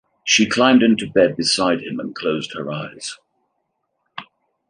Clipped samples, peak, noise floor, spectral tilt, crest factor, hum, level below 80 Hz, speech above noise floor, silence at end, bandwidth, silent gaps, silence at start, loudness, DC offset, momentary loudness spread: under 0.1%; -2 dBFS; -73 dBFS; -3.5 dB/octave; 18 dB; none; -60 dBFS; 55 dB; 0.45 s; 10.5 kHz; none; 0.25 s; -18 LUFS; under 0.1%; 21 LU